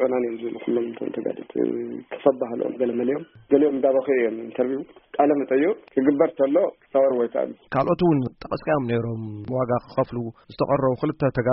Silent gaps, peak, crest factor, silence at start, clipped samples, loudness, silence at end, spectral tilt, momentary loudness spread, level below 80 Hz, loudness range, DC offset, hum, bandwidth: none; -4 dBFS; 18 dB; 0 s; under 0.1%; -23 LUFS; 0 s; -7 dB/octave; 10 LU; -56 dBFS; 3 LU; under 0.1%; none; 5.6 kHz